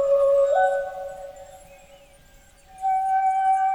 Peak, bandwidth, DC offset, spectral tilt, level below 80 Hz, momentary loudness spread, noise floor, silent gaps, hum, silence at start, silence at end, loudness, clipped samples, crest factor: -10 dBFS; 11.5 kHz; under 0.1%; -2.5 dB/octave; -56 dBFS; 20 LU; -52 dBFS; none; none; 0 s; 0 s; -22 LUFS; under 0.1%; 12 dB